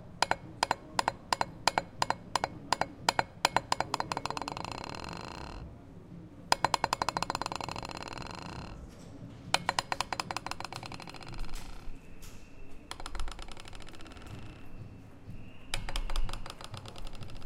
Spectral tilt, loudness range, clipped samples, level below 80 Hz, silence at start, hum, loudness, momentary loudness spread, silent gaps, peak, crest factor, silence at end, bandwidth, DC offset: -3 dB/octave; 14 LU; under 0.1%; -44 dBFS; 0 s; none; -35 LUFS; 19 LU; none; -4 dBFS; 32 dB; 0 s; 17 kHz; under 0.1%